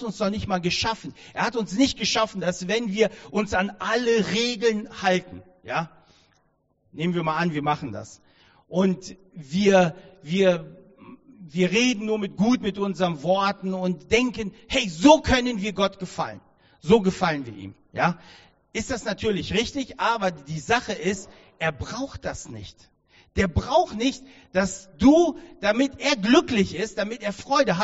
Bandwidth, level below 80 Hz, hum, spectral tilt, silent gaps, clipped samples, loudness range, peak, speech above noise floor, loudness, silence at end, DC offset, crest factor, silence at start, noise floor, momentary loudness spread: 8 kHz; -46 dBFS; none; -4 dB/octave; none; under 0.1%; 6 LU; -4 dBFS; 44 dB; -24 LUFS; 0 s; under 0.1%; 22 dB; 0 s; -67 dBFS; 14 LU